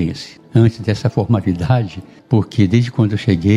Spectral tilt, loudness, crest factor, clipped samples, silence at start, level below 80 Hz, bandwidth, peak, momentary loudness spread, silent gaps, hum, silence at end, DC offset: -8 dB/octave; -16 LUFS; 14 dB; under 0.1%; 0 s; -42 dBFS; 9 kHz; 0 dBFS; 8 LU; none; none; 0 s; under 0.1%